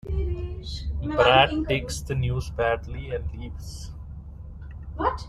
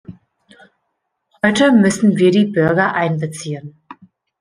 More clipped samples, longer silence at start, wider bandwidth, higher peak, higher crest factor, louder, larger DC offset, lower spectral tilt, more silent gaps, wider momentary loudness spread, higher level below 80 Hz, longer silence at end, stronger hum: neither; about the same, 0.05 s vs 0.1 s; first, 13.5 kHz vs 10.5 kHz; about the same, -4 dBFS vs -2 dBFS; first, 22 dB vs 16 dB; second, -25 LUFS vs -15 LUFS; neither; about the same, -5 dB/octave vs -6 dB/octave; neither; first, 22 LU vs 15 LU; first, -36 dBFS vs -56 dBFS; second, 0 s vs 0.45 s; neither